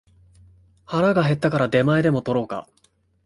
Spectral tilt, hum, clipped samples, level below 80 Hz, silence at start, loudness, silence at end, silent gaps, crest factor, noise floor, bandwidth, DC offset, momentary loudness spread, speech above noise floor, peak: -8 dB/octave; none; under 0.1%; -54 dBFS; 0.9 s; -21 LUFS; 0.65 s; none; 18 dB; -53 dBFS; 11.5 kHz; under 0.1%; 10 LU; 33 dB; -6 dBFS